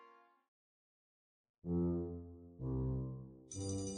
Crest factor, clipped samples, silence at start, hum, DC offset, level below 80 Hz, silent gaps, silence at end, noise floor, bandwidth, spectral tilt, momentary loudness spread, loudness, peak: 16 dB; under 0.1%; 0 s; none; under 0.1%; -56 dBFS; 0.48-1.44 s, 1.50-1.62 s; 0 s; under -90 dBFS; 10.5 kHz; -7 dB/octave; 14 LU; -42 LUFS; -28 dBFS